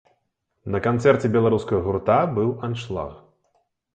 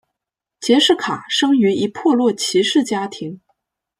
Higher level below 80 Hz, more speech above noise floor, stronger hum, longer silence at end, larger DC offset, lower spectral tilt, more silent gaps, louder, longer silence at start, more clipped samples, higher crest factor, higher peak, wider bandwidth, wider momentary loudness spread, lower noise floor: first, -48 dBFS vs -64 dBFS; second, 53 dB vs 67 dB; neither; about the same, 0.75 s vs 0.65 s; neither; first, -8 dB/octave vs -3.5 dB/octave; neither; second, -22 LUFS vs -17 LUFS; about the same, 0.65 s vs 0.6 s; neither; about the same, 18 dB vs 16 dB; about the same, -4 dBFS vs -2 dBFS; second, 9 kHz vs 14.5 kHz; about the same, 12 LU vs 13 LU; second, -74 dBFS vs -83 dBFS